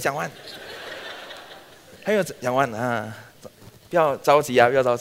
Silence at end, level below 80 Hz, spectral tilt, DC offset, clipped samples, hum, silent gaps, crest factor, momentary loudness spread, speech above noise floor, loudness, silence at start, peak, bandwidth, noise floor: 0 s; -62 dBFS; -4.5 dB/octave; under 0.1%; under 0.1%; none; none; 22 dB; 20 LU; 24 dB; -22 LUFS; 0 s; -2 dBFS; 16 kHz; -46 dBFS